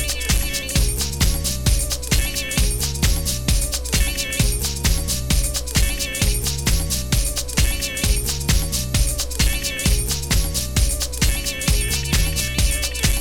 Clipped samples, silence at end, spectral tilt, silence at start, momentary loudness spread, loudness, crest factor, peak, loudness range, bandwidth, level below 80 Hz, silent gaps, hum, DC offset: under 0.1%; 0 s; -3 dB/octave; 0 s; 1 LU; -20 LUFS; 16 dB; -4 dBFS; 0 LU; 19 kHz; -22 dBFS; none; none; under 0.1%